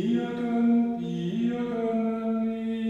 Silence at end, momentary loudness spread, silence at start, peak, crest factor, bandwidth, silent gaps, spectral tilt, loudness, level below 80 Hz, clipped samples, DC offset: 0 s; 6 LU; 0 s; -14 dBFS; 12 dB; 6.8 kHz; none; -8 dB/octave; -27 LUFS; -64 dBFS; under 0.1%; under 0.1%